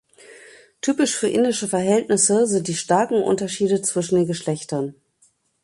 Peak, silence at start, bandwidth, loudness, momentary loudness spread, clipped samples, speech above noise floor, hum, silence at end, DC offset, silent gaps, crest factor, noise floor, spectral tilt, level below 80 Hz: -4 dBFS; 0.3 s; 11.5 kHz; -20 LUFS; 9 LU; under 0.1%; 42 dB; none; 0.7 s; under 0.1%; none; 18 dB; -62 dBFS; -4 dB/octave; -64 dBFS